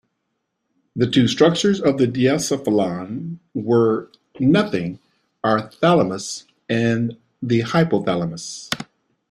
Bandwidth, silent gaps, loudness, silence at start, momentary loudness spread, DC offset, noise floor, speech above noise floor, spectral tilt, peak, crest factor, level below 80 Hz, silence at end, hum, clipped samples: 14.5 kHz; none; -20 LUFS; 0.95 s; 13 LU; under 0.1%; -75 dBFS; 56 dB; -5.5 dB/octave; -2 dBFS; 18 dB; -56 dBFS; 0.45 s; none; under 0.1%